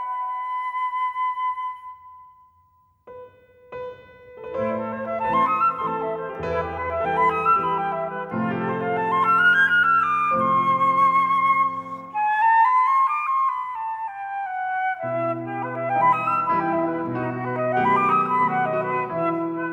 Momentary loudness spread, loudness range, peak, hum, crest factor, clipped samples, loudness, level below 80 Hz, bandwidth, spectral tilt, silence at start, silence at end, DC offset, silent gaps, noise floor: 12 LU; 11 LU; -8 dBFS; none; 14 dB; under 0.1%; -22 LUFS; -58 dBFS; 9.2 kHz; -7 dB/octave; 0 s; 0 s; under 0.1%; none; -60 dBFS